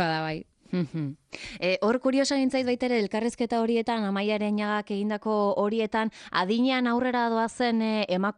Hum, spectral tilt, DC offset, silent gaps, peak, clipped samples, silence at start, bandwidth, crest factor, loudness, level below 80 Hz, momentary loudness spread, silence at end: none; -5.5 dB/octave; under 0.1%; none; -12 dBFS; under 0.1%; 0 s; 11 kHz; 16 dB; -27 LUFS; -64 dBFS; 7 LU; 0.05 s